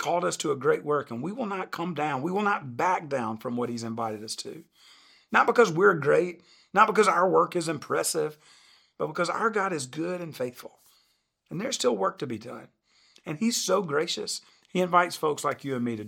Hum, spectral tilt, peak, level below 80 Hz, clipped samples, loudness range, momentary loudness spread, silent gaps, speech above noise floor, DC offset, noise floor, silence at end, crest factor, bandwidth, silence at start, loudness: none; -4 dB/octave; -4 dBFS; -76 dBFS; under 0.1%; 8 LU; 14 LU; none; 44 dB; under 0.1%; -71 dBFS; 0 s; 22 dB; 17 kHz; 0 s; -27 LUFS